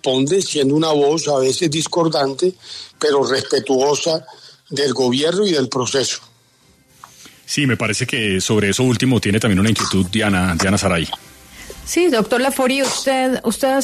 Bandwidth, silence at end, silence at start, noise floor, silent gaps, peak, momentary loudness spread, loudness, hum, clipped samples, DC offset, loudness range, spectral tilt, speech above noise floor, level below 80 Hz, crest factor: 13.5 kHz; 0 s; 0.05 s; -54 dBFS; none; -4 dBFS; 6 LU; -17 LUFS; none; under 0.1%; under 0.1%; 3 LU; -4.5 dB/octave; 37 dB; -48 dBFS; 14 dB